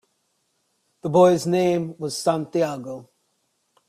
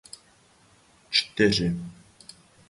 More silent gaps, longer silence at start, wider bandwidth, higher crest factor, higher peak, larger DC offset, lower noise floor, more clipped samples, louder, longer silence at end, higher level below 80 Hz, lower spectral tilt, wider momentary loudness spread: neither; about the same, 1.05 s vs 1.1 s; first, 14.5 kHz vs 11.5 kHz; about the same, 18 dB vs 22 dB; about the same, -4 dBFS vs -6 dBFS; neither; first, -71 dBFS vs -59 dBFS; neither; first, -21 LUFS vs -24 LUFS; about the same, 0.85 s vs 0.8 s; second, -66 dBFS vs -52 dBFS; first, -6 dB/octave vs -4.5 dB/octave; second, 17 LU vs 25 LU